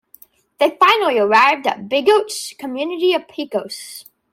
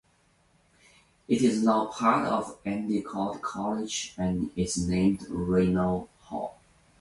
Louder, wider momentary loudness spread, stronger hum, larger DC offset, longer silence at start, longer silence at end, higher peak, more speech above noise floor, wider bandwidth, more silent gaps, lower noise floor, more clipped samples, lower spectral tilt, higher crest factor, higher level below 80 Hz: first, -16 LUFS vs -28 LUFS; first, 15 LU vs 10 LU; neither; neither; second, 0.6 s vs 1.3 s; second, 0.3 s vs 0.5 s; first, -2 dBFS vs -10 dBFS; second, 32 dB vs 39 dB; first, 16.5 kHz vs 11.5 kHz; neither; second, -49 dBFS vs -66 dBFS; neither; second, -2.5 dB/octave vs -5.5 dB/octave; about the same, 16 dB vs 18 dB; second, -70 dBFS vs -50 dBFS